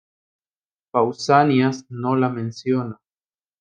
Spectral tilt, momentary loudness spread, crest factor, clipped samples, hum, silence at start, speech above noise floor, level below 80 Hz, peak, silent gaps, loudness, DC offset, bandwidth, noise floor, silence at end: -6.5 dB/octave; 11 LU; 20 dB; under 0.1%; none; 0.95 s; over 70 dB; -70 dBFS; -2 dBFS; none; -20 LUFS; under 0.1%; 9.2 kHz; under -90 dBFS; 0.65 s